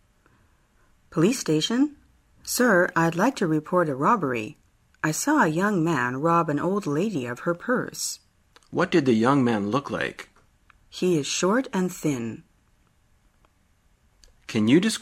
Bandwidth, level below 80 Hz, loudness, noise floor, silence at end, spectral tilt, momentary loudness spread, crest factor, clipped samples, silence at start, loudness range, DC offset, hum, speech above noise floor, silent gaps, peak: 16 kHz; -62 dBFS; -24 LUFS; -63 dBFS; 0 s; -5 dB/octave; 11 LU; 20 dB; under 0.1%; 1.1 s; 5 LU; under 0.1%; none; 40 dB; none; -6 dBFS